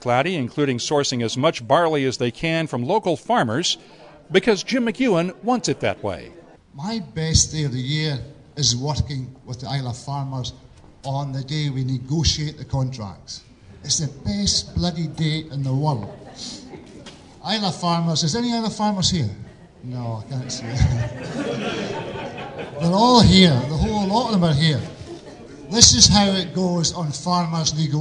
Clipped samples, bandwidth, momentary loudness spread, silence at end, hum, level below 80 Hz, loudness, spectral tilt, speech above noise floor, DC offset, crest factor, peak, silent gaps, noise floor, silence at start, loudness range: under 0.1%; 12 kHz; 16 LU; 0 s; none; -40 dBFS; -20 LUFS; -4 dB/octave; 21 dB; under 0.1%; 22 dB; 0 dBFS; none; -42 dBFS; 0 s; 9 LU